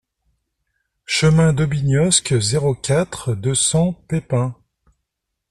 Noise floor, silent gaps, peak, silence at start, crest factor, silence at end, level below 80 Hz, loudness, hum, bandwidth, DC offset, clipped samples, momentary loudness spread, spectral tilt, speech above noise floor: -78 dBFS; none; -2 dBFS; 1.1 s; 18 dB; 0.95 s; -44 dBFS; -18 LUFS; none; 12.5 kHz; under 0.1%; under 0.1%; 8 LU; -4.5 dB/octave; 61 dB